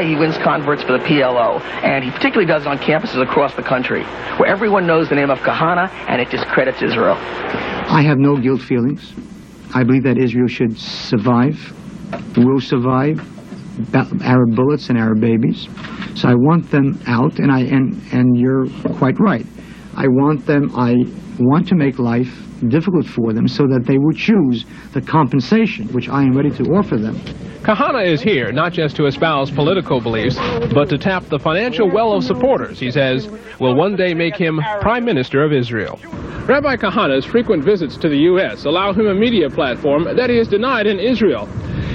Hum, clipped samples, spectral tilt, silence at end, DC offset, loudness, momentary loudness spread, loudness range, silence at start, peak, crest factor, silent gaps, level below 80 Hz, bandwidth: none; under 0.1%; -8 dB/octave; 0 s; under 0.1%; -16 LUFS; 9 LU; 2 LU; 0 s; 0 dBFS; 16 dB; none; -42 dBFS; 7.2 kHz